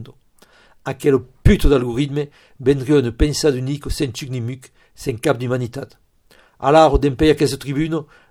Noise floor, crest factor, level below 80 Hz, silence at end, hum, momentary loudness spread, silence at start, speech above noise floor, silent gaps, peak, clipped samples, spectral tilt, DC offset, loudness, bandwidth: -53 dBFS; 18 dB; -28 dBFS; 0.25 s; none; 14 LU; 0 s; 36 dB; none; 0 dBFS; under 0.1%; -6 dB/octave; under 0.1%; -18 LUFS; 16.5 kHz